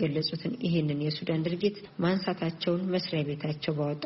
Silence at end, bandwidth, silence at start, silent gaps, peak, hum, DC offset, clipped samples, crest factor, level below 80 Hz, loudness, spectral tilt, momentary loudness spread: 0 s; 6 kHz; 0 s; none; -14 dBFS; none; under 0.1%; under 0.1%; 16 dB; -64 dBFS; -30 LUFS; -5.5 dB/octave; 3 LU